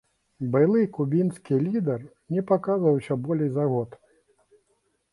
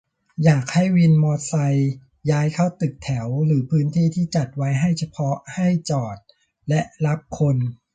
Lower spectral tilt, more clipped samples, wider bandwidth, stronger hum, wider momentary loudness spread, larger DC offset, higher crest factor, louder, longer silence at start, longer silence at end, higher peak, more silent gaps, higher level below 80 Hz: first, -10 dB/octave vs -7 dB/octave; neither; first, 11.5 kHz vs 9.2 kHz; neither; about the same, 9 LU vs 8 LU; neither; about the same, 16 dB vs 16 dB; second, -25 LUFS vs -21 LUFS; about the same, 0.4 s vs 0.4 s; first, 1.25 s vs 0.2 s; second, -8 dBFS vs -4 dBFS; neither; second, -66 dBFS vs -54 dBFS